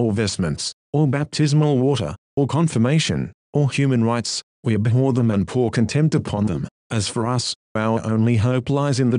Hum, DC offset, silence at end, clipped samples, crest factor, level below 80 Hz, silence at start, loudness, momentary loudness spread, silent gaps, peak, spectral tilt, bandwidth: none; under 0.1%; 0 s; under 0.1%; 14 dB; -48 dBFS; 0 s; -20 LUFS; 7 LU; 0.73-0.93 s, 2.18-2.37 s, 3.34-3.53 s, 4.43-4.63 s, 6.71-6.90 s, 7.55-7.75 s; -6 dBFS; -6 dB/octave; 11 kHz